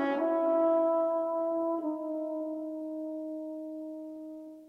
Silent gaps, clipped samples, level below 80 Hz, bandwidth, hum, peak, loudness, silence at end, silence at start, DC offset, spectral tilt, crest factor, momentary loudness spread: none; under 0.1%; -82 dBFS; 5 kHz; 60 Hz at -80 dBFS; -18 dBFS; -32 LUFS; 0 s; 0 s; under 0.1%; -6.5 dB/octave; 14 dB; 15 LU